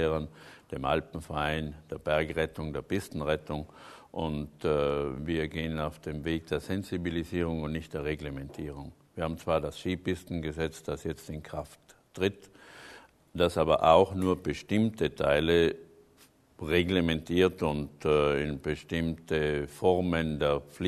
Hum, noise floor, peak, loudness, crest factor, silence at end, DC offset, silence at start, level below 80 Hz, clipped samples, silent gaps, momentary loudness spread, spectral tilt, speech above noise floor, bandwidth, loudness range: none; -61 dBFS; -8 dBFS; -30 LUFS; 22 dB; 0 s; under 0.1%; 0 s; -48 dBFS; under 0.1%; none; 14 LU; -6.5 dB/octave; 31 dB; 13.5 kHz; 8 LU